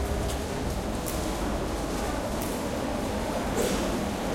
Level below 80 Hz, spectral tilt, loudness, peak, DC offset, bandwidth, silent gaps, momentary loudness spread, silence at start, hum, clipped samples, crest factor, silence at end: -36 dBFS; -5 dB/octave; -30 LUFS; -14 dBFS; under 0.1%; 16.5 kHz; none; 4 LU; 0 s; none; under 0.1%; 16 dB; 0 s